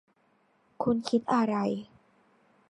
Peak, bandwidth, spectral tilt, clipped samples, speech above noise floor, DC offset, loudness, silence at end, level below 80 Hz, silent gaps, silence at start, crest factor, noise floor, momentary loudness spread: -12 dBFS; 11 kHz; -6.5 dB/octave; under 0.1%; 41 dB; under 0.1%; -29 LUFS; 0.85 s; -70 dBFS; none; 0.8 s; 20 dB; -69 dBFS; 7 LU